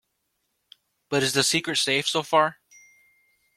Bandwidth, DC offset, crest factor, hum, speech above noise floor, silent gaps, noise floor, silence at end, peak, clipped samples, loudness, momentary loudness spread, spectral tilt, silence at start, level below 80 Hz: 16 kHz; under 0.1%; 22 dB; none; 53 dB; none; -76 dBFS; 1.05 s; -6 dBFS; under 0.1%; -23 LUFS; 5 LU; -2.5 dB/octave; 1.1 s; -66 dBFS